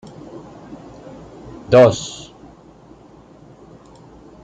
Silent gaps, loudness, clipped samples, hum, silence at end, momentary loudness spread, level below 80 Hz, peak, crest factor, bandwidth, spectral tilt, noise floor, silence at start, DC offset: none; -14 LUFS; under 0.1%; none; 2.3 s; 27 LU; -50 dBFS; -2 dBFS; 20 dB; 9.2 kHz; -5.5 dB/octave; -45 dBFS; 0.7 s; under 0.1%